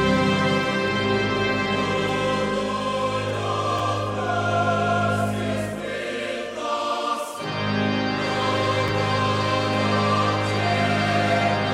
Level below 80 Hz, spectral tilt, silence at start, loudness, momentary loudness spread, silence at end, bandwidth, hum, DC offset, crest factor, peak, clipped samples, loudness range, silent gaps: -50 dBFS; -5.5 dB/octave; 0 s; -23 LUFS; 6 LU; 0 s; 14 kHz; none; under 0.1%; 14 dB; -8 dBFS; under 0.1%; 4 LU; none